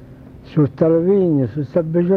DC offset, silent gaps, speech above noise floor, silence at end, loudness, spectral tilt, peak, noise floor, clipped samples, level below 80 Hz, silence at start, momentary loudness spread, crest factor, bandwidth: under 0.1%; none; 23 dB; 0 s; -17 LUFS; -11.5 dB/octave; -4 dBFS; -39 dBFS; under 0.1%; -48 dBFS; 0 s; 6 LU; 14 dB; 5 kHz